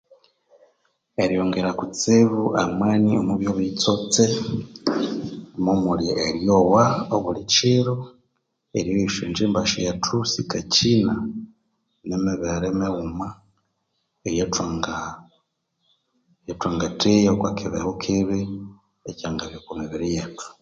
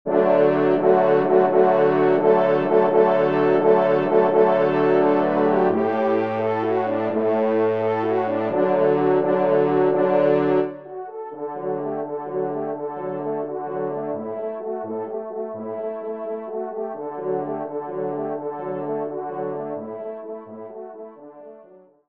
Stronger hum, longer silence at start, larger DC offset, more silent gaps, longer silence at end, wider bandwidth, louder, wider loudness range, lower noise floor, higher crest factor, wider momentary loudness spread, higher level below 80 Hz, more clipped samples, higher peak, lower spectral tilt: neither; first, 1.2 s vs 0.05 s; second, under 0.1% vs 0.1%; neither; second, 0.1 s vs 0.45 s; first, 9.2 kHz vs 5.4 kHz; about the same, -22 LUFS vs -21 LUFS; second, 8 LU vs 11 LU; first, -74 dBFS vs -49 dBFS; about the same, 20 dB vs 16 dB; first, 16 LU vs 13 LU; first, -48 dBFS vs -72 dBFS; neither; about the same, -4 dBFS vs -4 dBFS; second, -5 dB/octave vs -9.5 dB/octave